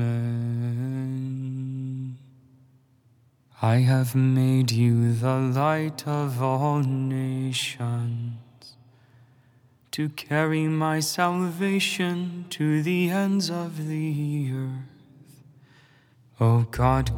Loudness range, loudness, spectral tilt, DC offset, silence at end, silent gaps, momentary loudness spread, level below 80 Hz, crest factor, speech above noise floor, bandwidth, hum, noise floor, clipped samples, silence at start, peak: 8 LU; -25 LUFS; -6 dB/octave; under 0.1%; 0 s; none; 11 LU; -48 dBFS; 20 dB; 37 dB; 17 kHz; none; -61 dBFS; under 0.1%; 0 s; -6 dBFS